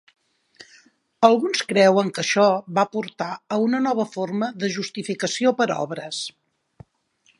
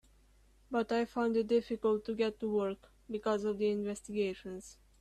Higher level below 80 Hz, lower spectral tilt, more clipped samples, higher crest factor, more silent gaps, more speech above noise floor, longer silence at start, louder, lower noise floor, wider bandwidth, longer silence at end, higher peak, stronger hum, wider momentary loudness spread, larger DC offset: second, -70 dBFS vs -64 dBFS; second, -4.5 dB/octave vs -6 dB/octave; neither; first, 22 dB vs 16 dB; neither; first, 43 dB vs 31 dB; first, 1.2 s vs 0.7 s; first, -22 LUFS vs -34 LUFS; about the same, -64 dBFS vs -65 dBFS; about the same, 11.5 kHz vs 12.5 kHz; first, 1.1 s vs 0.25 s; first, 0 dBFS vs -20 dBFS; neither; about the same, 11 LU vs 13 LU; neither